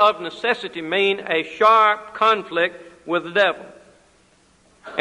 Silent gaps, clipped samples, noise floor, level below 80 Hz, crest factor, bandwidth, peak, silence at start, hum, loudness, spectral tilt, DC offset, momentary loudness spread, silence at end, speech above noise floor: none; under 0.1%; -57 dBFS; -66 dBFS; 18 dB; 11 kHz; -2 dBFS; 0 s; none; -19 LUFS; -4 dB/octave; under 0.1%; 10 LU; 0 s; 37 dB